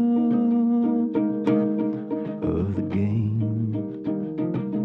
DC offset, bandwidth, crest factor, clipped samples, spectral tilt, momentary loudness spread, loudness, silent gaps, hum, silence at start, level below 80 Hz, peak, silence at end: under 0.1%; 4.1 kHz; 14 dB; under 0.1%; -11 dB/octave; 8 LU; -24 LUFS; none; none; 0 s; -52 dBFS; -10 dBFS; 0 s